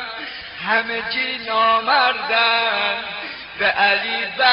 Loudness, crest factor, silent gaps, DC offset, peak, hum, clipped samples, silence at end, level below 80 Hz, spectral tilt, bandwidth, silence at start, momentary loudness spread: -18 LUFS; 16 dB; none; under 0.1%; -2 dBFS; none; under 0.1%; 0 s; -58 dBFS; 2 dB/octave; 5.6 kHz; 0 s; 13 LU